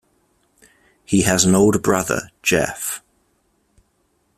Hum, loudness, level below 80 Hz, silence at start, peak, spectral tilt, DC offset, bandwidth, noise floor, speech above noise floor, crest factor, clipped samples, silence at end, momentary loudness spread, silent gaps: none; -18 LUFS; -48 dBFS; 1.1 s; 0 dBFS; -4 dB/octave; under 0.1%; 15.5 kHz; -65 dBFS; 48 dB; 20 dB; under 0.1%; 1.4 s; 12 LU; none